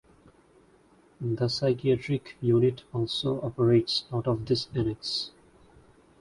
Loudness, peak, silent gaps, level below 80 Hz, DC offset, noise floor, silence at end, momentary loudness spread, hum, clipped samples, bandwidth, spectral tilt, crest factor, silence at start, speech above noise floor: -27 LUFS; -10 dBFS; none; -56 dBFS; under 0.1%; -60 dBFS; 0.9 s; 9 LU; none; under 0.1%; 11.5 kHz; -7 dB/octave; 18 dB; 1.2 s; 33 dB